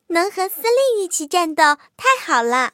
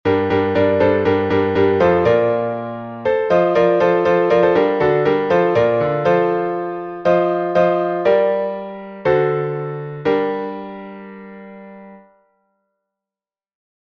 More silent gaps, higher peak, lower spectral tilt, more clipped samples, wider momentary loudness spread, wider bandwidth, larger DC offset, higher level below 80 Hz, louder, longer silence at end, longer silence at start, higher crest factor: neither; about the same, -2 dBFS vs -2 dBFS; second, -0.5 dB/octave vs -8 dB/octave; neither; second, 5 LU vs 14 LU; first, 17 kHz vs 6.2 kHz; neither; second, -74 dBFS vs -52 dBFS; about the same, -18 LUFS vs -17 LUFS; second, 0.05 s vs 1.85 s; about the same, 0.1 s vs 0.05 s; about the same, 16 dB vs 16 dB